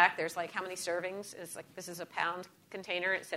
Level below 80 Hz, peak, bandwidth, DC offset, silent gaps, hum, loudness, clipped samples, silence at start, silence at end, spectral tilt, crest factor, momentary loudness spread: -84 dBFS; -10 dBFS; 16 kHz; under 0.1%; none; none; -36 LUFS; under 0.1%; 0 s; 0 s; -2.5 dB/octave; 26 dB; 12 LU